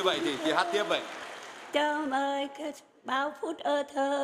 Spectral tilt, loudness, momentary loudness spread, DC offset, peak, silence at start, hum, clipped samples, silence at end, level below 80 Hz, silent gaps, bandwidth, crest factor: -3 dB/octave; -31 LUFS; 13 LU; under 0.1%; -12 dBFS; 0 s; none; under 0.1%; 0 s; -76 dBFS; none; 15.5 kHz; 20 dB